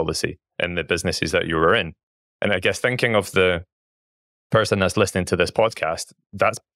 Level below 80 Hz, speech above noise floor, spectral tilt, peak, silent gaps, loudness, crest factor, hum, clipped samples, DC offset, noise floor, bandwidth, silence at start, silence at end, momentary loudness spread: -48 dBFS; over 69 dB; -4.5 dB/octave; -4 dBFS; 2.03-2.40 s, 3.72-4.50 s; -21 LUFS; 18 dB; none; under 0.1%; under 0.1%; under -90 dBFS; 15.5 kHz; 0 s; 0.2 s; 9 LU